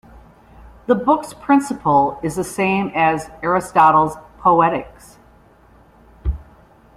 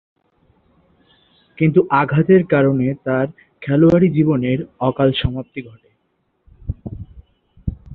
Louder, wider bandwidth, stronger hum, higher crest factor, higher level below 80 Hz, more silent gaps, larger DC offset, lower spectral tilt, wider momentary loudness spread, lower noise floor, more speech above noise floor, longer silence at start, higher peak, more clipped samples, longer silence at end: about the same, -17 LUFS vs -16 LUFS; first, 15.5 kHz vs 4.4 kHz; neither; about the same, 18 dB vs 16 dB; about the same, -38 dBFS vs -40 dBFS; neither; neither; second, -6 dB/octave vs -10 dB/octave; second, 14 LU vs 19 LU; second, -49 dBFS vs -67 dBFS; second, 33 dB vs 51 dB; second, 0.9 s vs 1.6 s; about the same, -2 dBFS vs -2 dBFS; neither; first, 0.55 s vs 0 s